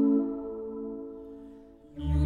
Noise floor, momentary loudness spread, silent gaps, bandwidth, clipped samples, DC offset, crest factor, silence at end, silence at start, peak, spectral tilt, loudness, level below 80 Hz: -50 dBFS; 20 LU; none; 4.2 kHz; under 0.1%; under 0.1%; 16 dB; 0 s; 0 s; -16 dBFS; -10.5 dB/octave; -33 LUFS; -38 dBFS